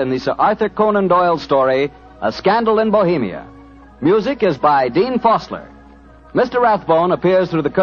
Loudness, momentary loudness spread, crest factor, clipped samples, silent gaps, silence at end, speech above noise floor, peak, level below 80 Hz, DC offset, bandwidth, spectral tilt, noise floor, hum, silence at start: -16 LUFS; 9 LU; 14 dB; under 0.1%; none; 0 s; 27 dB; -2 dBFS; -48 dBFS; under 0.1%; 7 kHz; -7.5 dB/octave; -42 dBFS; none; 0 s